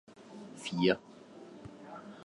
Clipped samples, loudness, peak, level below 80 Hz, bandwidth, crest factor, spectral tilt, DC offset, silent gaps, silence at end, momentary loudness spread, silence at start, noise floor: under 0.1%; -33 LUFS; -12 dBFS; -70 dBFS; 11.5 kHz; 24 dB; -5.5 dB/octave; under 0.1%; none; 0 s; 22 LU; 0.1 s; -52 dBFS